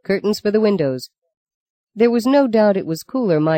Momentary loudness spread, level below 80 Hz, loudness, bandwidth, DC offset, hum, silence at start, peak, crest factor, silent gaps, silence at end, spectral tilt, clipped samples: 9 LU; -62 dBFS; -17 LUFS; 16.5 kHz; under 0.1%; none; 0.1 s; -4 dBFS; 14 dB; 1.37-1.46 s, 1.54-1.87 s; 0 s; -6.5 dB/octave; under 0.1%